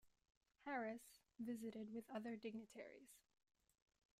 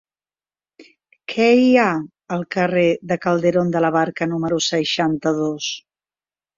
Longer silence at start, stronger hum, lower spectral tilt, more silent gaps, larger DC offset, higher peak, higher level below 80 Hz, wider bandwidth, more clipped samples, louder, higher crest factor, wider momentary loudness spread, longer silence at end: second, 0.05 s vs 0.8 s; neither; about the same, -5 dB/octave vs -5 dB/octave; first, 0.37-0.41 s vs none; neither; second, -36 dBFS vs -2 dBFS; second, -90 dBFS vs -60 dBFS; first, 15.5 kHz vs 7.6 kHz; neither; second, -53 LUFS vs -19 LUFS; about the same, 18 dB vs 16 dB; about the same, 14 LU vs 12 LU; first, 1 s vs 0.8 s